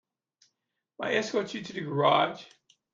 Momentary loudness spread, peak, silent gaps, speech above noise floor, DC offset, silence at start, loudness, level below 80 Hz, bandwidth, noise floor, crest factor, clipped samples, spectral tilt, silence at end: 13 LU; -10 dBFS; none; 55 dB; under 0.1%; 1 s; -28 LUFS; -76 dBFS; 7.6 kHz; -83 dBFS; 22 dB; under 0.1%; -5 dB/octave; 0.5 s